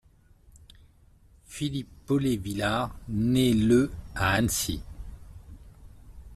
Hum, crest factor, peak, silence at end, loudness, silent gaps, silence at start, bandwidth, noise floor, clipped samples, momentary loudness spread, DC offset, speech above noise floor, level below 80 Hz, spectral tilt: none; 20 dB; -10 dBFS; 0 s; -27 LUFS; none; 1.5 s; 15.5 kHz; -57 dBFS; under 0.1%; 22 LU; under 0.1%; 32 dB; -46 dBFS; -5 dB/octave